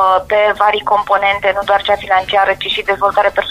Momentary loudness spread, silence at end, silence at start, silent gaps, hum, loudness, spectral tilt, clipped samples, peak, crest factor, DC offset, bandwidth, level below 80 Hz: 3 LU; 0 s; 0 s; none; none; -13 LUFS; -3.5 dB/octave; under 0.1%; 0 dBFS; 14 dB; under 0.1%; 15 kHz; -44 dBFS